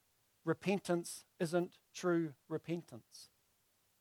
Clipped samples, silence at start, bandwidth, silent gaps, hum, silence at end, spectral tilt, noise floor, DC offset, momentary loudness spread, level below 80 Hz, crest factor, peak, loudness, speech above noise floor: under 0.1%; 0.45 s; 16.5 kHz; none; none; 0.75 s; -6 dB/octave; -77 dBFS; under 0.1%; 18 LU; -84 dBFS; 20 dB; -20 dBFS; -39 LUFS; 38 dB